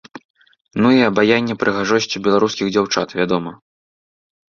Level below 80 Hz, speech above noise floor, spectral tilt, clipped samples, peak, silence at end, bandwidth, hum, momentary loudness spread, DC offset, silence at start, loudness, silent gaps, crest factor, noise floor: -56 dBFS; over 74 dB; -5 dB/octave; under 0.1%; 0 dBFS; 0.95 s; 7.4 kHz; none; 7 LU; under 0.1%; 0.15 s; -17 LUFS; 0.25-0.34 s, 0.61-0.65 s; 18 dB; under -90 dBFS